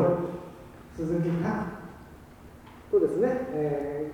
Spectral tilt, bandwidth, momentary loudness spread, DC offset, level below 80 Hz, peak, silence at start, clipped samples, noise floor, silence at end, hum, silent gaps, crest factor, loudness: -9 dB/octave; 19 kHz; 24 LU; under 0.1%; -54 dBFS; -12 dBFS; 0 s; under 0.1%; -49 dBFS; 0 s; none; none; 18 dB; -29 LUFS